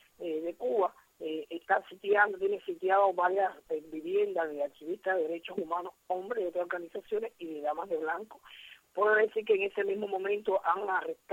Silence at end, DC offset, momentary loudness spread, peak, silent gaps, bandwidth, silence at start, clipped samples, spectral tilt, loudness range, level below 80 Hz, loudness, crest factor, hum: 0 s; under 0.1%; 12 LU; -12 dBFS; none; 16 kHz; 0.2 s; under 0.1%; -5.5 dB/octave; 5 LU; -78 dBFS; -32 LUFS; 20 dB; none